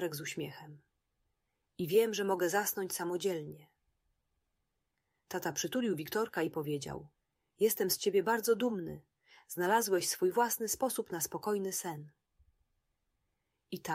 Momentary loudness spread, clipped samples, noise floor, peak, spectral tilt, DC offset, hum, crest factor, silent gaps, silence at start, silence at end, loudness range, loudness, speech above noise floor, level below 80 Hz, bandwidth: 14 LU; under 0.1%; -84 dBFS; -16 dBFS; -3.5 dB/octave; under 0.1%; none; 18 dB; none; 0 s; 0 s; 7 LU; -34 LUFS; 50 dB; -74 dBFS; 16 kHz